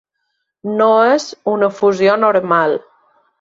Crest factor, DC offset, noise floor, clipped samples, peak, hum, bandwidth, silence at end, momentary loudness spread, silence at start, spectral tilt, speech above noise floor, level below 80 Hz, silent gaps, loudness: 14 dB; under 0.1%; -71 dBFS; under 0.1%; -2 dBFS; none; 7.8 kHz; 0.6 s; 10 LU; 0.65 s; -5 dB/octave; 58 dB; -64 dBFS; none; -14 LUFS